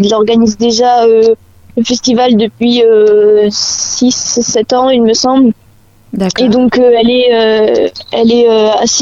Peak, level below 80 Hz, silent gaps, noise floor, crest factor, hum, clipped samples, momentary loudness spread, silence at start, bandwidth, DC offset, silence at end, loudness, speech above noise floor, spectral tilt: 0 dBFS; -44 dBFS; none; -33 dBFS; 8 dB; none; under 0.1%; 7 LU; 0 s; 7.8 kHz; under 0.1%; 0 s; -9 LUFS; 25 dB; -3.5 dB/octave